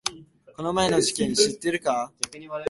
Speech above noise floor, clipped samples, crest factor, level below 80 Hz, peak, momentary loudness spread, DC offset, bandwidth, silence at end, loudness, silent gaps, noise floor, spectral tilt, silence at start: 20 dB; under 0.1%; 24 dB; -56 dBFS; -2 dBFS; 10 LU; under 0.1%; 12 kHz; 0 s; -24 LUFS; none; -45 dBFS; -3 dB/octave; 0.05 s